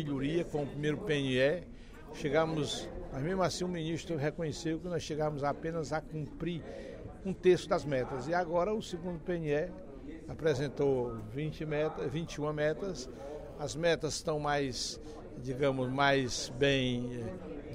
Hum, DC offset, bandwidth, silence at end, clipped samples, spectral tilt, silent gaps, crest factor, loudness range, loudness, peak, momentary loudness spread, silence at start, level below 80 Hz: none; under 0.1%; 15.5 kHz; 0 s; under 0.1%; -5 dB/octave; none; 20 dB; 3 LU; -34 LUFS; -14 dBFS; 13 LU; 0 s; -52 dBFS